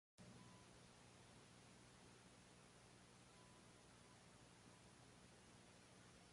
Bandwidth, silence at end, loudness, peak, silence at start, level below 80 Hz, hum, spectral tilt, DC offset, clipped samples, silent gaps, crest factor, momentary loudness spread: 11.5 kHz; 0 s; -66 LUFS; -50 dBFS; 0.15 s; -82 dBFS; 60 Hz at -75 dBFS; -3.5 dB/octave; under 0.1%; under 0.1%; none; 16 dB; 2 LU